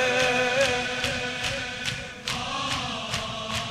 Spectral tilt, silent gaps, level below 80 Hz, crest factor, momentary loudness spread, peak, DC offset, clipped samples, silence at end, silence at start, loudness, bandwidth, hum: -2.5 dB/octave; none; -48 dBFS; 18 dB; 8 LU; -8 dBFS; under 0.1%; under 0.1%; 0 s; 0 s; -26 LUFS; 15.5 kHz; none